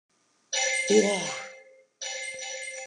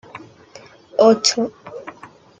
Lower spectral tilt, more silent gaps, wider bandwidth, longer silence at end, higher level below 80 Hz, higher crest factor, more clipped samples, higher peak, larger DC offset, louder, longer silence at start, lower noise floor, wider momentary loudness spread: about the same, -2 dB/octave vs -3 dB/octave; neither; first, 10.5 kHz vs 9.4 kHz; second, 0 s vs 0.5 s; second, -88 dBFS vs -68 dBFS; about the same, 22 dB vs 20 dB; neither; second, -8 dBFS vs -2 dBFS; neither; second, -27 LUFS vs -16 LUFS; first, 0.5 s vs 0.15 s; first, -53 dBFS vs -45 dBFS; second, 15 LU vs 26 LU